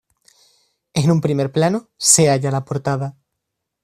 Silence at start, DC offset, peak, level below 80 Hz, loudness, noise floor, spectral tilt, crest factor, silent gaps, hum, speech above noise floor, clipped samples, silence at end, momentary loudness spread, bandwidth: 0.95 s; under 0.1%; 0 dBFS; -56 dBFS; -17 LUFS; -78 dBFS; -4.5 dB/octave; 20 dB; none; none; 61 dB; under 0.1%; 0.7 s; 12 LU; 14.5 kHz